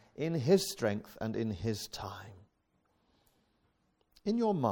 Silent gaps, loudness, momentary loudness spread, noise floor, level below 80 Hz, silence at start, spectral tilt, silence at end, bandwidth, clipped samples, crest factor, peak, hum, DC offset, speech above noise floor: none; -34 LUFS; 15 LU; -76 dBFS; -64 dBFS; 0.2 s; -6 dB/octave; 0 s; 18 kHz; under 0.1%; 20 dB; -14 dBFS; none; under 0.1%; 43 dB